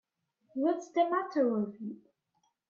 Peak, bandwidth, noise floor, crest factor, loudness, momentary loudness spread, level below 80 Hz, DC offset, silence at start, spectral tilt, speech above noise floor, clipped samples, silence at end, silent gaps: -16 dBFS; 7.4 kHz; -77 dBFS; 16 dB; -31 LUFS; 14 LU; -84 dBFS; under 0.1%; 0.55 s; -6.5 dB/octave; 46 dB; under 0.1%; 0.75 s; none